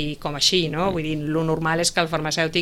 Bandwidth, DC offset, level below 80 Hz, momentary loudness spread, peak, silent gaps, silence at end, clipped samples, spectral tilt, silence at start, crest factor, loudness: 16 kHz; under 0.1%; -42 dBFS; 6 LU; -4 dBFS; none; 0 s; under 0.1%; -3.5 dB/octave; 0 s; 18 dB; -21 LUFS